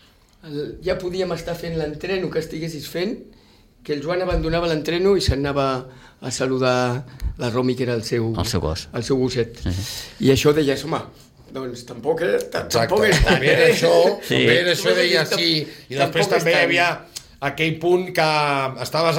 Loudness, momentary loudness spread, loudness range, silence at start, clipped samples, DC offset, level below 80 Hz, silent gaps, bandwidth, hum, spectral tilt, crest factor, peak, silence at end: -20 LUFS; 13 LU; 9 LU; 0.45 s; under 0.1%; under 0.1%; -36 dBFS; none; 17 kHz; none; -4.5 dB/octave; 16 dB; -4 dBFS; 0 s